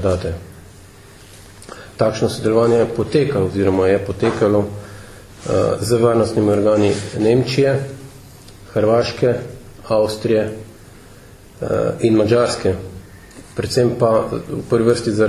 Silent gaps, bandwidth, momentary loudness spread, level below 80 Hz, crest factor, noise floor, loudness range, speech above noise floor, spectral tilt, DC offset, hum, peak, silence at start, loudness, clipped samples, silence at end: none; 15 kHz; 17 LU; -40 dBFS; 16 dB; -42 dBFS; 3 LU; 25 dB; -6.5 dB/octave; under 0.1%; none; -2 dBFS; 0 s; -17 LUFS; under 0.1%; 0 s